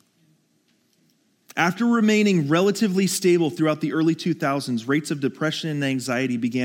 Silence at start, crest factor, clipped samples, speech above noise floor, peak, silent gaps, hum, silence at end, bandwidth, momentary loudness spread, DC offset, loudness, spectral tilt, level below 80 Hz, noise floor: 1.55 s; 18 dB; under 0.1%; 44 dB; -6 dBFS; none; none; 0 s; 17 kHz; 6 LU; under 0.1%; -22 LUFS; -5.5 dB/octave; -78 dBFS; -65 dBFS